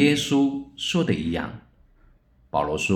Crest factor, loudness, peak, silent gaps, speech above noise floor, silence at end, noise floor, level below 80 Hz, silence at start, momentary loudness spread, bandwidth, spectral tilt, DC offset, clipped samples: 18 dB; -24 LUFS; -6 dBFS; none; 34 dB; 0 s; -57 dBFS; -52 dBFS; 0 s; 10 LU; 15 kHz; -5 dB/octave; under 0.1%; under 0.1%